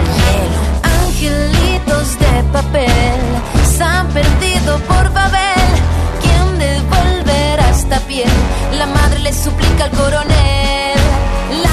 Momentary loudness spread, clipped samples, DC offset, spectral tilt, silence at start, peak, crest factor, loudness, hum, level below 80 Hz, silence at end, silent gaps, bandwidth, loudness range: 3 LU; under 0.1%; under 0.1%; -5 dB/octave; 0 s; 0 dBFS; 12 dB; -13 LUFS; none; -16 dBFS; 0 s; none; 14 kHz; 1 LU